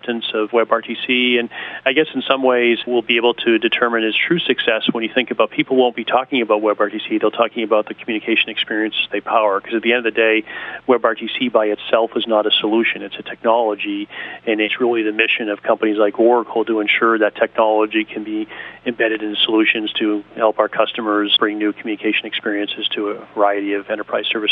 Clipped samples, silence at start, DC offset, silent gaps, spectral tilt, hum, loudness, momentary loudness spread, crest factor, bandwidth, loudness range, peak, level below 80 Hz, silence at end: under 0.1%; 0.05 s; under 0.1%; none; -7.5 dB/octave; none; -17 LUFS; 7 LU; 18 dB; 4.1 kHz; 2 LU; 0 dBFS; -66 dBFS; 0 s